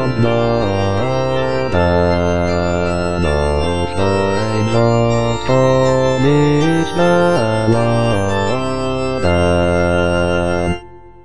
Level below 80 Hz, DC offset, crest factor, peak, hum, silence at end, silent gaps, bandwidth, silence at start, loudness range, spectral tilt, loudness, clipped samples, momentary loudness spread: -32 dBFS; 5%; 12 dB; -2 dBFS; none; 0 s; none; 10 kHz; 0 s; 2 LU; -6.5 dB/octave; -15 LUFS; under 0.1%; 5 LU